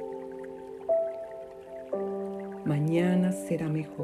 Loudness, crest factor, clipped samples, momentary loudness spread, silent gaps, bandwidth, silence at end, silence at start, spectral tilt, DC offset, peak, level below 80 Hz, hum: -30 LUFS; 16 dB; under 0.1%; 16 LU; none; 13.5 kHz; 0 s; 0 s; -8 dB/octave; under 0.1%; -14 dBFS; -66 dBFS; none